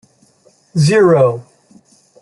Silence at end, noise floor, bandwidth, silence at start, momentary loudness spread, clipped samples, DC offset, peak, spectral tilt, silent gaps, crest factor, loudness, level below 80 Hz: 0.8 s; -52 dBFS; 11.5 kHz; 0.75 s; 14 LU; under 0.1%; under 0.1%; -2 dBFS; -6.5 dB/octave; none; 14 dB; -12 LUFS; -56 dBFS